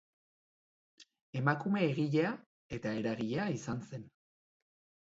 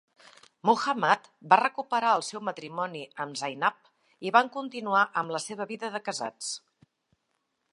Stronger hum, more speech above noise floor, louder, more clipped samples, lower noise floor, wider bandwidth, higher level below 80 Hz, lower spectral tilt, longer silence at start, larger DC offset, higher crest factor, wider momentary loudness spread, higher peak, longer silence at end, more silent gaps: neither; first, over 56 dB vs 50 dB; second, -35 LUFS vs -28 LUFS; neither; first, under -90 dBFS vs -78 dBFS; second, 7.6 kHz vs 11 kHz; first, -70 dBFS vs -84 dBFS; first, -6 dB/octave vs -3 dB/octave; first, 1 s vs 0.65 s; neither; about the same, 22 dB vs 24 dB; first, 15 LU vs 12 LU; second, -14 dBFS vs -4 dBFS; second, 0.95 s vs 1.15 s; first, 1.22-1.33 s, 2.46-2.69 s vs none